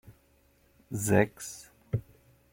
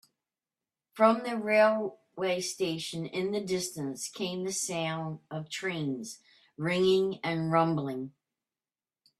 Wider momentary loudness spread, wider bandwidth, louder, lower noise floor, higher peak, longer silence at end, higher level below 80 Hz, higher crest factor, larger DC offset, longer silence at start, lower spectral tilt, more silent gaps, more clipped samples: first, 16 LU vs 13 LU; first, 16.5 kHz vs 14 kHz; about the same, -31 LUFS vs -30 LUFS; second, -65 dBFS vs under -90 dBFS; about the same, -8 dBFS vs -10 dBFS; second, 0.55 s vs 1.1 s; first, -60 dBFS vs -72 dBFS; about the same, 26 dB vs 22 dB; neither; second, 0.1 s vs 0.95 s; first, -6 dB/octave vs -4.5 dB/octave; neither; neither